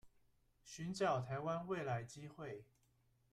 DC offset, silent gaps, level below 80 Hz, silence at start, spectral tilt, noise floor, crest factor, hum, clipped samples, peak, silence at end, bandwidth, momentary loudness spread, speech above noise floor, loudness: under 0.1%; none; -74 dBFS; 0.05 s; -6 dB/octave; -77 dBFS; 20 dB; none; under 0.1%; -26 dBFS; 0.7 s; 13.5 kHz; 14 LU; 34 dB; -43 LUFS